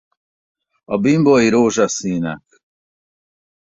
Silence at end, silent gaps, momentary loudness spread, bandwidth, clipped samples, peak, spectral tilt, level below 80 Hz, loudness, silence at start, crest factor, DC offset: 1.25 s; none; 12 LU; 8 kHz; under 0.1%; -2 dBFS; -5.5 dB/octave; -56 dBFS; -16 LUFS; 0.9 s; 16 dB; under 0.1%